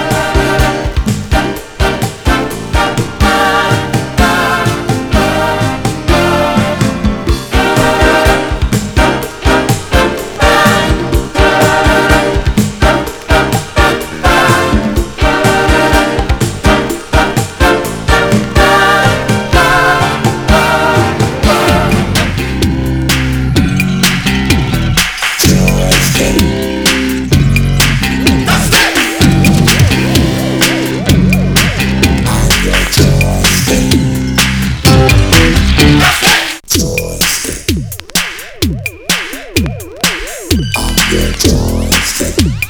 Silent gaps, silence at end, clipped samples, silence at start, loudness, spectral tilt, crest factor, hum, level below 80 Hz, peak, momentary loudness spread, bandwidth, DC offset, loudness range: none; 0 s; 0.5%; 0 s; -10 LUFS; -4.5 dB/octave; 10 dB; none; -18 dBFS; 0 dBFS; 7 LU; over 20 kHz; under 0.1%; 4 LU